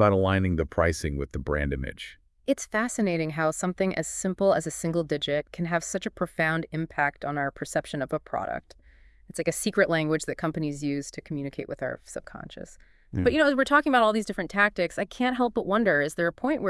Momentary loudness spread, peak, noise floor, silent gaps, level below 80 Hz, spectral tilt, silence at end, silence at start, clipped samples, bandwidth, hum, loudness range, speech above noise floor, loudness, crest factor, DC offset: 13 LU; -6 dBFS; -54 dBFS; none; -46 dBFS; -5 dB/octave; 0 s; 0 s; under 0.1%; 12 kHz; none; 6 LU; 28 dB; -27 LUFS; 20 dB; under 0.1%